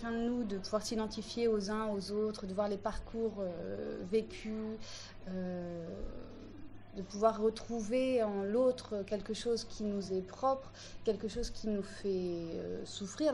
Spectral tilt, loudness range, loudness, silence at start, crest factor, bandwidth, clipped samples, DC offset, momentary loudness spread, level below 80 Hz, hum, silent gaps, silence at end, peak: -5.5 dB/octave; 6 LU; -37 LUFS; 0 s; 20 dB; 11.5 kHz; under 0.1%; under 0.1%; 13 LU; -54 dBFS; none; none; 0 s; -16 dBFS